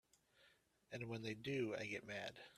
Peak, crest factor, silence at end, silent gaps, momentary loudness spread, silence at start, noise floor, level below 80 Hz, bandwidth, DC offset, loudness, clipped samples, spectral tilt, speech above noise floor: -32 dBFS; 18 dB; 0 s; none; 7 LU; 0.4 s; -75 dBFS; -82 dBFS; 14 kHz; under 0.1%; -47 LUFS; under 0.1%; -5.5 dB/octave; 28 dB